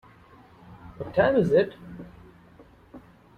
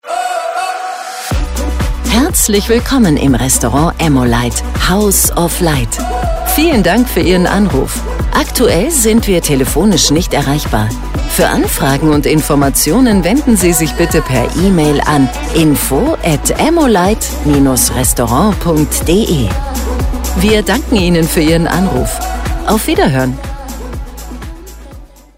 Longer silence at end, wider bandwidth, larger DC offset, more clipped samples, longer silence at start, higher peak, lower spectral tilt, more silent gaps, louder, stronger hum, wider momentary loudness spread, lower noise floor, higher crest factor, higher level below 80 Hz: about the same, 0.4 s vs 0.3 s; second, 9.4 kHz vs 16.5 kHz; second, under 0.1% vs 0.4%; neither; first, 0.7 s vs 0.05 s; second, -10 dBFS vs 0 dBFS; first, -8 dB/octave vs -4.5 dB/octave; neither; second, -23 LUFS vs -11 LUFS; neither; first, 26 LU vs 8 LU; first, -53 dBFS vs -33 dBFS; first, 18 dB vs 12 dB; second, -56 dBFS vs -20 dBFS